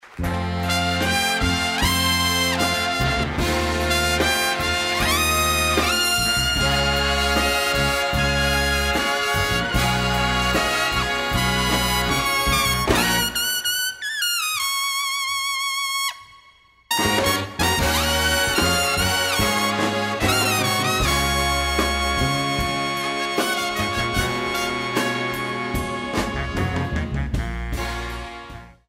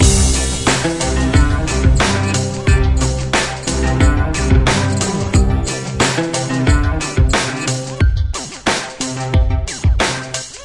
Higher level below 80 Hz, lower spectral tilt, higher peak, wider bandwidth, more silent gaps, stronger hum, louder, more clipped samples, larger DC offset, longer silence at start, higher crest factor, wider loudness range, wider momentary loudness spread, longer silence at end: second, -32 dBFS vs -20 dBFS; second, -3 dB/octave vs -4.5 dB/octave; second, -4 dBFS vs 0 dBFS; first, 16 kHz vs 11.5 kHz; neither; neither; second, -20 LUFS vs -16 LUFS; neither; neither; about the same, 0.05 s vs 0 s; about the same, 18 dB vs 14 dB; about the same, 4 LU vs 2 LU; about the same, 7 LU vs 6 LU; first, 0.15 s vs 0 s